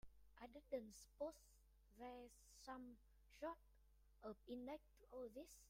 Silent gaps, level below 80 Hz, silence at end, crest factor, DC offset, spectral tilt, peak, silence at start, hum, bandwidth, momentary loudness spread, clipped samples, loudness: none; -74 dBFS; 0 s; 20 dB; under 0.1%; -4.5 dB/octave; -36 dBFS; 0.05 s; none; 16 kHz; 10 LU; under 0.1%; -57 LUFS